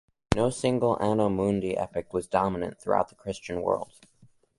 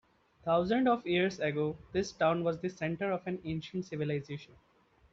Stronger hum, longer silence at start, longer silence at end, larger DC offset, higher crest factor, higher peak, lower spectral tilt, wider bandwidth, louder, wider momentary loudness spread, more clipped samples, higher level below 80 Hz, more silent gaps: neither; second, 0.3 s vs 0.45 s; about the same, 0.75 s vs 0.65 s; neither; first, 24 dB vs 18 dB; first, -4 dBFS vs -16 dBFS; first, -6.5 dB/octave vs -5 dB/octave; first, 11.5 kHz vs 7.8 kHz; first, -28 LUFS vs -33 LUFS; about the same, 8 LU vs 9 LU; neither; first, -48 dBFS vs -64 dBFS; neither